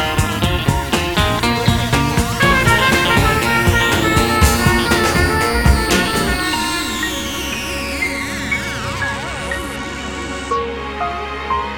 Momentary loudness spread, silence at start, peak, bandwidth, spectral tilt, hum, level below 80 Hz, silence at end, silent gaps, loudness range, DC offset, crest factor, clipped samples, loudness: 10 LU; 0 s; 0 dBFS; 19 kHz; -4 dB/octave; none; -26 dBFS; 0 s; none; 8 LU; under 0.1%; 16 dB; under 0.1%; -16 LUFS